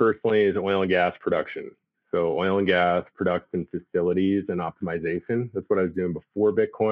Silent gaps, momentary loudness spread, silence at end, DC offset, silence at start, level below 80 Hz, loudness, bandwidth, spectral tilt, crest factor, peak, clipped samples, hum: none; 8 LU; 0 s; under 0.1%; 0 s; -60 dBFS; -25 LUFS; 5.2 kHz; -9.5 dB/octave; 16 dB; -8 dBFS; under 0.1%; none